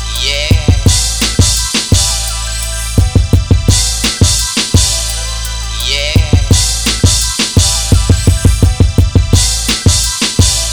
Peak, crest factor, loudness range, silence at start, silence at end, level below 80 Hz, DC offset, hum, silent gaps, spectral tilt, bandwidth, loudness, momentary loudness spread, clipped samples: 0 dBFS; 10 dB; 1 LU; 0 s; 0 s; -16 dBFS; under 0.1%; none; none; -3.5 dB/octave; over 20 kHz; -11 LUFS; 5 LU; 0.3%